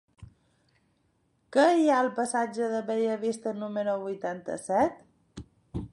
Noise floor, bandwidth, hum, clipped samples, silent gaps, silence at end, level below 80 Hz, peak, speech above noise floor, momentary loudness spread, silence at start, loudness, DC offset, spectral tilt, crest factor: -71 dBFS; 11.5 kHz; none; under 0.1%; none; 0.05 s; -58 dBFS; -10 dBFS; 44 dB; 17 LU; 0.2 s; -28 LUFS; under 0.1%; -5 dB/octave; 18 dB